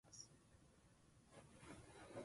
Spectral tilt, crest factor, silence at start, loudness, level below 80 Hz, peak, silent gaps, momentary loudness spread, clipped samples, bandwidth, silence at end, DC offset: -4 dB/octave; 22 dB; 0.05 s; -62 LUFS; -76 dBFS; -42 dBFS; none; 7 LU; under 0.1%; 11.5 kHz; 0 s; under 0.1%